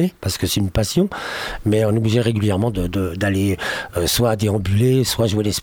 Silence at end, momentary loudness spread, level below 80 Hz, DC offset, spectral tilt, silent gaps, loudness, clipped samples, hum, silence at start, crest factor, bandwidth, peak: 0 s; 6 LU; -38 dBFS; under 0.1%; -5.5 dB/octave; none; -19 LUFS; under 0.1%; none; 0 s; 14 dB; 19.5 kHz; -4 dBFS